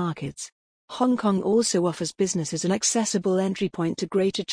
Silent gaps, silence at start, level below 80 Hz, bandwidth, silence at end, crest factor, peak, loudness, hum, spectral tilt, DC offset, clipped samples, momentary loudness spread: 0.52-0.88 s; 0 s; -62 dBFS; 10.5 kHz; 0 s; 16 dB; -8 dBFS; -24 LUFS; none; -4.5 dB/octave; under 0.1%; under 0.1%; 11 LU